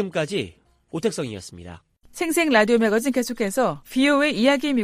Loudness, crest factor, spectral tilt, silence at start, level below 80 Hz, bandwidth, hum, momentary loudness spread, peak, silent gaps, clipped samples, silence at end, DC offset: -21 LUFS; 18 dB; -4 dB/octave; 0 s; -56 dBFS; 15.5 kHz; none; 17 LU; -4 dBFS; none; under 0.1%; 0 s; under 0.1%